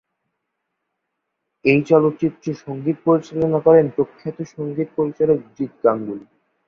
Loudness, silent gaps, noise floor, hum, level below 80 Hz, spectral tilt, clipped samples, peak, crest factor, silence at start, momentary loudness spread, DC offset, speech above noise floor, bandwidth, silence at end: -19 LUFS; none; -77 dBFS; none; -58 dBFS; -8.5 dB/octave; under 0.1%; -2 dBFS; 18 dB; 1.65 s; 15 LU; under 0.1%; 59 dB; 6.8 kHz; 0.45 s